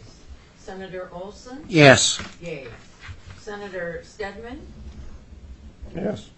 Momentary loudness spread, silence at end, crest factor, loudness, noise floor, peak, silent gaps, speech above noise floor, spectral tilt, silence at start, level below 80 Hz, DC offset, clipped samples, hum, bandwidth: 28 LU; 0.15 s; 24 dB; -19 LUFS; -45 dBFS; 0 dBFS; none; 23 dB; -4 dB/octave; 0 s; -46 dBFS; under 0.1%; under 0.1%; none; 10 kHz